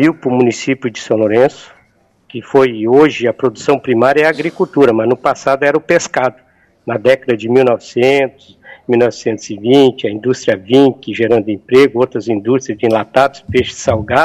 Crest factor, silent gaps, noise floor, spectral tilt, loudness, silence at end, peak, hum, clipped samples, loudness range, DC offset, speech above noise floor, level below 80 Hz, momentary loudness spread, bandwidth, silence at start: 12 dB; none; -54 dBFS; -5.5 dB/octave; -13 LUFS; 0 s; 0 dBFS; none; under 0.1%; 2 LU; under 0.1%; 42 dB; -48 dBFS; 8 LU; 11 kHz; 0 s